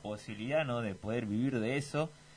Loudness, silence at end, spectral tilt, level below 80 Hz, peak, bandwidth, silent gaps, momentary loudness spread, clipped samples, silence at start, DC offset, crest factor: -35 LUFS; 0 s; -6.5 dB/octave; -66 dBFS; -20 dBFS; 10.5 kHz; none; 5 LU; under 0.1%; 0 s; under 0.1%; 16 dB